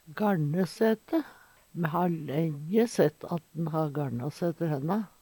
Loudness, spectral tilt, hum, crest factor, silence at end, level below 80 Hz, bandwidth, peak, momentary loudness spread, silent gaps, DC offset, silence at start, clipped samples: -30 LUFS; -7.5 dB/octave; none; 18 dB; 0.15 s; -70 dBFS; 19 kHz; -10 dBFS; 7 LU; none; under 0.1%; 0.1 s; under 0.1%